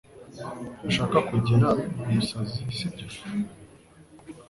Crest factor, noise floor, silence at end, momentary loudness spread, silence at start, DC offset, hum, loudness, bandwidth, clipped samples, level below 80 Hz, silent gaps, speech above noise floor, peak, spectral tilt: 20 dB; -52 dBFS; 0.05 s; 17 LU; 0.15 s; under 0.1%; none; -27 LUFS; 11.5 kHz; under 0.1%; -52 dBFS; none; 26 dB; -8 dBFS; -6.5 dB/octave